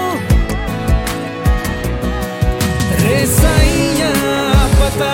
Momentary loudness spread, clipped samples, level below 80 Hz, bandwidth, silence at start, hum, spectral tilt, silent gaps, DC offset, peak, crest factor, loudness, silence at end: 8 LU; under 0.1%; -18 dBFS; 17 kHz; 0 s; none; -5 dB/octave; none; under 0.1%; 0 dBFS; 14 dB; -15 LUFS; 0 s